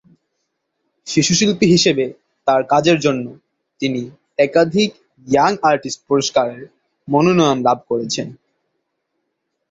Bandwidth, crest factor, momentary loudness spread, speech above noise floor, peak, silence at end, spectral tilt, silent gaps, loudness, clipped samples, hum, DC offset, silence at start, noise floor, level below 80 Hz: 8 kHz; 18 dB; 12 LU; 58 dB; 0 dBFS; 1.4 s; -4.5 dB/octave; none; -16 LUFS; under 0.1%; none; under 0.1%; 1.05 s; -74 dBFS; -56 dBFS